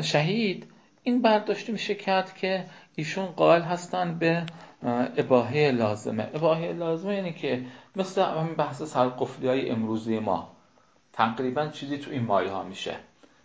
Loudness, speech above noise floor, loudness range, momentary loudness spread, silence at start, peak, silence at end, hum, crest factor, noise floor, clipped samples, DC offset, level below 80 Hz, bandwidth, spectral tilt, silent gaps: -27 LUFS; 36 dB; 4 LU; 11 LU; 0 s; -6 dBFS; 0.4 s; none; 20 dB; -62 dBFS; under 0.1%; under 0.1%; -68 dBFS; 8 kHz; -6 dB/octave; none